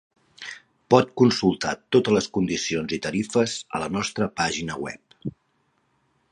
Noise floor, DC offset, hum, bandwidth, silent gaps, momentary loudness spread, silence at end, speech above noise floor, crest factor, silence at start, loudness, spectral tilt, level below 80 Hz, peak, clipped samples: -69 dBFS; under 0.1%; none; 11 kHz; none; 18 LU; 1 s; 46 dB; 22 dB; 0.4 s; -23 LUFS; -5 dB/octave; -56 dBFS; -2 dBFS; under 0.1%